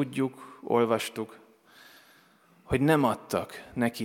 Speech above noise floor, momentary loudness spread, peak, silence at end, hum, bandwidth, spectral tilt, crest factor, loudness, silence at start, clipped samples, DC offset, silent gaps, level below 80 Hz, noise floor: 33 dB; 15 LU; -10 dBFS; 0 s; none; 17 kHz; -6 dB/octave; 20 dB; -28 LUFS; 0 s; under 0.1%; under 0.1%; none; -56 dBFS; -61 dBFS